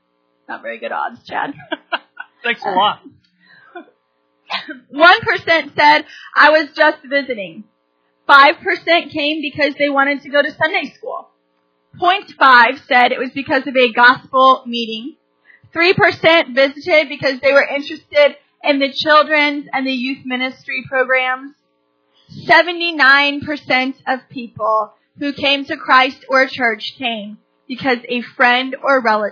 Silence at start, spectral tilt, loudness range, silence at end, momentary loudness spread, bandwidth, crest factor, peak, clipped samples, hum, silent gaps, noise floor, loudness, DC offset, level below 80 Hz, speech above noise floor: 0.5 s; -4.5 dB/octave; 5 LU; 0 s; 15 LU; 5.4 kHz; 16 dB; 0 dBFS; under 0.1%; none; none; -64 dBFS; -14 LUFS; under 0.1%; -64 dBFS; 49 dB